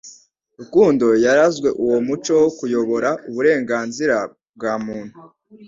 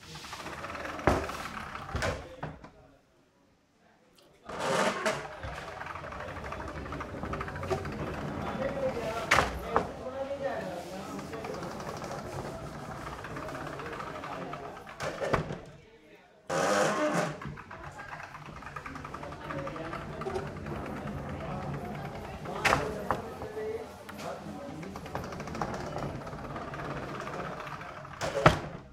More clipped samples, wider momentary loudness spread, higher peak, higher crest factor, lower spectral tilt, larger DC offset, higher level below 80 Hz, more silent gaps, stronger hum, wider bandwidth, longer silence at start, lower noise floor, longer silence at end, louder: neither; about the same, 12 LU vs 14 LU; about the same, -2 dBFS vs -4 dBFS; second, 16 dB vs 32 dB; about the same, -5 dB/octave vs -5 dB/octave; neither; second, -58 dBFS vs -50 dBFS; first, 4.49-4.53 s vs none; neither; second, 7.8 kHz vs 16 kHz; about the same, 0.05 s vs 0 s; second, -47 dBFS vs -66 dBFS; about the same, 0 s vs 0 s; first, -18 LUFS vs -35 LUFS